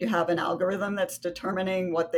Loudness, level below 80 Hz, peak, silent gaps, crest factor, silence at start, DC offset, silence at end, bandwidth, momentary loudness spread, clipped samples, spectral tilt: -28 LUFS; -64 dBFS; -12 dBFS; none; 16 dB; 0 s; under 0.1%; 0 s; 18 kHz; 5 LU; under 0.1%; -5.5 dB/octave